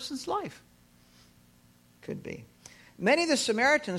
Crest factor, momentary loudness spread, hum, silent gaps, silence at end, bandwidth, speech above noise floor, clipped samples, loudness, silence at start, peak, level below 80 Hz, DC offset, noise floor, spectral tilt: 20 dB; 19 LU; none; none; 0 s; 16 kHz; 32 dB; under 0.1%; -28 LUFS; 0 s; -10 dBFS; -66 dBFS; under 0.1%; -61 dBFS; -3 dB/octave